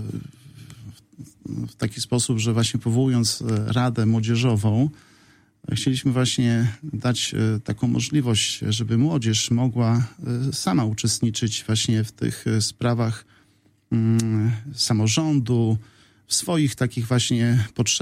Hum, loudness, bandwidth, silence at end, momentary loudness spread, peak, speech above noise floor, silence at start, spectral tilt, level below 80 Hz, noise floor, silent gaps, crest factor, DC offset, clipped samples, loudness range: none; -22 LUFS; 15.5 kHz; 0 s; 7 LU; -6 dBFS; 39 dB; 0 s; -5 dB/octave; -54 dBFS; -60 dBFS; none; 16 dB; under 0.1%; under 0.1%; 2 LU